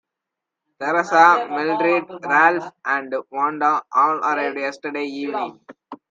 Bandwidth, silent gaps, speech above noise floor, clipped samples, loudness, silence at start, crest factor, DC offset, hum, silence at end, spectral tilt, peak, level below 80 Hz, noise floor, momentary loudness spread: 7.6 kHz; none; 64 dB; under 0.1%; -19 LUFS; 0.8 s; 20 dB; under 0.1%; none; 0.15 s; -4.5 dB/octave; 0 dBFS; -76 dBFS; -84 dBFS; 13 LU